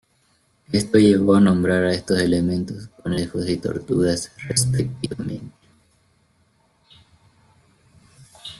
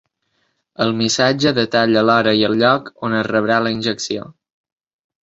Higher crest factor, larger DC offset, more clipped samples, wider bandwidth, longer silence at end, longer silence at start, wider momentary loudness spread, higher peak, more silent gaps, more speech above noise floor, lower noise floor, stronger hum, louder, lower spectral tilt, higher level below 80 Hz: about the same, 20 dB vs 16 dB; neither; neither; first, 12.5 kHz vs 8 kHz; second, 0.05 s vs 0.95 s; about the same, 0.7 s vs 0.8 s; first, 15 LU vs 8 LU; about the same, -2 dBFS vs -2 dBFS; neither; second, 43 dB vs 51 dB; second, -63 dBFS vs -67 dBFS; neither; second, -20 LUFS vs -16 LUFS; about the same, -5.5 dB/octave vs -4.5 dB/octave; first, -50 dBFS vs -56 dBFS